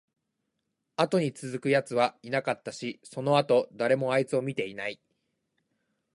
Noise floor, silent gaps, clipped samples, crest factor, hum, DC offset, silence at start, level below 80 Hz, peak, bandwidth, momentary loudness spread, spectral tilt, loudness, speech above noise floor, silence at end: -81 dBFS; none; under 0.1%; 22 dB; none; under 0.1%; 1 s; -76 dBFS; -8 dBFS; 11.5 kHz; 12 LU; -5.5 dB/octave; -28 LUFS; 53 dB; 1.25 s